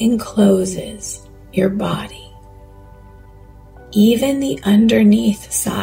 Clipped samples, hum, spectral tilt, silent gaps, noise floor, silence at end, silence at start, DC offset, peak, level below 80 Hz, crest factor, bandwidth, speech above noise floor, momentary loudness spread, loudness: under 0.1%; none; -5.5 dB/octave; none; -41 dBFS; 0 s; 0 s; under 0.1%; -2 dBFS; -42 dBFS; 14 dB; 16.5 kHz; 26 dB; 16 LU; -16 LUFS